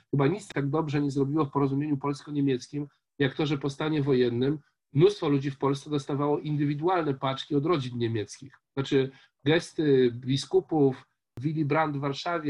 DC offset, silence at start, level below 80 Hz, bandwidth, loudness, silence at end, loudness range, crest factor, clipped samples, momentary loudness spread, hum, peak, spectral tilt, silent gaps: under 0.1%; 0.15 s; -64 dBFS; 11 kHz; -28 LUFS; 0 s; 2 LU; 18 dB; under 0.1%; 9 LU; none; -10 dBFS; -7 dB/octave; none